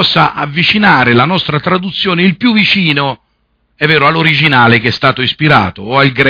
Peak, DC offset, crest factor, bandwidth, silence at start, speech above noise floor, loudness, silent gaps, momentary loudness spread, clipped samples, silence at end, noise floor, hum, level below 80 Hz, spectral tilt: 0 dBFS; under 0.1%; 10 dB; 5.4 kHz; 0 s; 49 dB; -9 LUFS; none; 6 LU; 0.2%; 0 s; -59 dBFS; none; -44 dBFS; -7 dB/octave